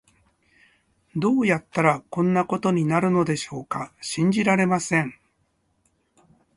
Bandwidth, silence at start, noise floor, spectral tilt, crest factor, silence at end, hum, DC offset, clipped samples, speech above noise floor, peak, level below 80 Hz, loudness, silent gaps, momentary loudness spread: 11.5 kHz; 1.15 s; -69 dBFS; -6 dB/octave; 20 dB; 1.45 s; none; under 0.1%; under 0.1%; 47 dB; -4 dBFS; -62 dBFS; -23 LUFS; none; 10 LU